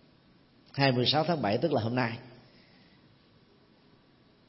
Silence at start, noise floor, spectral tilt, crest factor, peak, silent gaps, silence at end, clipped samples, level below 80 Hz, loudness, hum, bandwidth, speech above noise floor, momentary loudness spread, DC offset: 0.75 s; -62 dBFS; -8.5 dB/octave; 22 dB; -10 dBFS; none; 2.15 s; under 0.1%; -70 dBFS; -28 LUFS; none; 6 kHz; 34 dB; 11 LU; under 0.1%